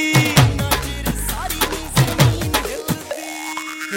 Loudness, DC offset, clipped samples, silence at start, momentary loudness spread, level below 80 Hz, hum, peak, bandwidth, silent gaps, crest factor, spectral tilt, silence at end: -19 LUFS; under 0.1%; under 0.1%; 0 s; 12 LU; -32 dBFS; none; 0 dBFS; 17 kHz; none; 18 dB; -4.5 dB/octave; 0 s